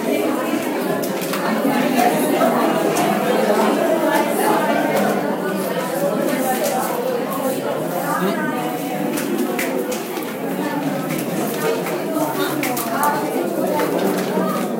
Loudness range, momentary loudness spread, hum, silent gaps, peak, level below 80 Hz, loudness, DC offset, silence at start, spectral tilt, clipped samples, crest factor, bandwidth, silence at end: 5 LU; 6 LU; none; none; -2 dBFS; -68 dBFS; -20 LUFS; under 0.1%; 0 s; -4.5 dB/octave; under 0.1%; 18 dB; 16.5 kHz; 0 s